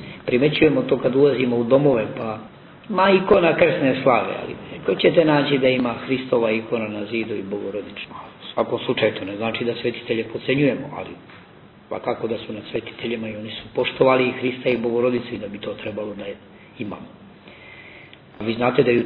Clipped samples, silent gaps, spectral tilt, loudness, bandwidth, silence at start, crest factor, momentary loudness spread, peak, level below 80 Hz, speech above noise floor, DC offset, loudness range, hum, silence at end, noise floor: under 0.1%; none; -9.5 dB/octave; -21 LUFS; 4.9 kHz; 0 s; 18 dB; 17 LU; -2 dBFS; -54 dBFS; 26 dB; under 0.1%; 9 LU; none; 0 s; -47 dBFS